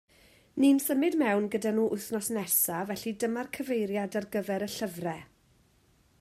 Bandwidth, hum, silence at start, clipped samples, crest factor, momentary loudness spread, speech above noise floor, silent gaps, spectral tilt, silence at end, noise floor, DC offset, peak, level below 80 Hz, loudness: 16 kHz; none; 0.55 s; under 0.1%; 16 dB; 10 LU; 36 dB; none; -4 dB/octave; 0.95 s; -65 dBFS; under 0.1%; -14 dBFS; -70 dBFS; -29 LUFS